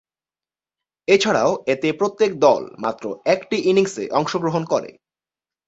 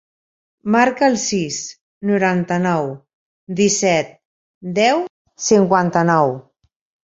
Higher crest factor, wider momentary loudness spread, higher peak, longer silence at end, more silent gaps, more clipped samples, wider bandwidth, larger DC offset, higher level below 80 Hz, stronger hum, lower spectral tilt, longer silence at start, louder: about the same, 18 dB vs 18 dB; second, 9 LU vs 16 LU; about the same, -2 dBFS vs -2 dBFS; about the same, 0.75 s vs 0.7 s; second, none vs 1.81-2.01 s, 3.13-3.47 s, 4.25-4.61 s, 5.10-5.25 s; neither; about the same, 8 kHz vs 8 kHz; neither; about the same, -62 dBFS vs -60 dBFS; neither; about the same, -5 dB/octave vs -4.5 dB/octave; first, 1.1 s vs 0.65 s; second, -20 LUFS vs -17 LUFS